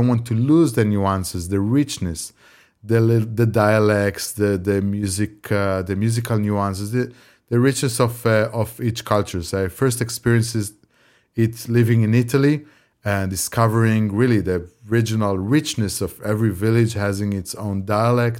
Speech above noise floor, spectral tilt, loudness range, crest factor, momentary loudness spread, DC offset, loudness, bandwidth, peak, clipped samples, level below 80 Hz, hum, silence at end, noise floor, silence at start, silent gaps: 39 dB; -6 dB/octave; 2 LU; 18 dB; 8 LU; under 0.1%; -20 LUFS; 16.5 kHz; -2 dBFS; under 0.1%; -50 dBFS; none; 0 s; -58 dBFS; 0 s; none